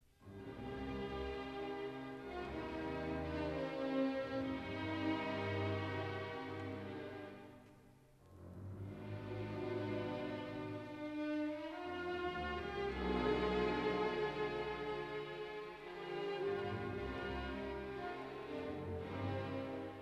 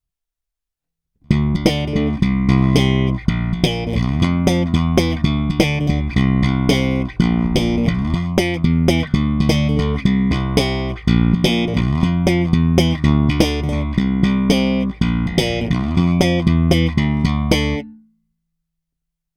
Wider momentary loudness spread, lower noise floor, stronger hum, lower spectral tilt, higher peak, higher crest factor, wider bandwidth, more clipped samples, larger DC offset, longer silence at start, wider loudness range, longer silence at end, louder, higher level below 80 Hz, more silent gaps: first, 10 LU vs 4 LU; second, -64 dBFS vs -82 dBFS; neither; about the same, -7 dB/octave vs -6.5 dB/octave; second, -24 dBFS vs 0 dBFS; about the same, 18 dB vs 16 dB; about the same, 13 kHz vs 13.5 kHz; neither; neither; second, 0.2 s vs 1.3 s; first, 7 LU vs 1 LU; second, 0 s vs 1.4 s; second, -42 LUFS vs -17 LUFS; second, -58 dBFS vs -26 dBFS; neither